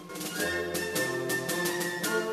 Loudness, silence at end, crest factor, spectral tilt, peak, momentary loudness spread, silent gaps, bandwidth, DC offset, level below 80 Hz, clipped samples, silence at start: -30 LUFS; 0 s; 16 dB; -3 dB/octave; -16 dBFS; 2 LU; none; 14 kHz; under 0.1%; -64 dBFS; under 0.1%; 0 s